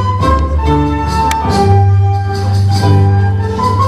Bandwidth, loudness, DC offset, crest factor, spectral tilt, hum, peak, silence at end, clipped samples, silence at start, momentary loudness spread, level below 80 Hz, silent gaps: 12 kHz; -12 LUFS; under 0.1%; 10 dB; -7 dB/octave; none; 0 dBFS; 0 s; under 0.1%; 0 s; 5 LU; -22 dBFS; none